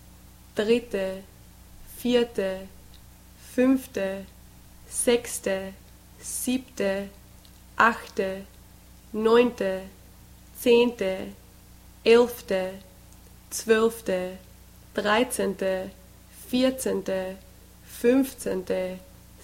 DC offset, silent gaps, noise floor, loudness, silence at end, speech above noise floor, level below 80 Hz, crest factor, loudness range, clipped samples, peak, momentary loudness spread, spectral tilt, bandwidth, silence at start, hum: under 0.1%; none; -50 dBFS; -26 LUFS; 0.4 s; 25 dB; -52 dBFS; 22 dB; 4 LU; under 0.1%; -4 dBFS; 20 LU; -4 dB/octave; 16.5 kHz; 0.55 s; 60 Hz at -55 dBFS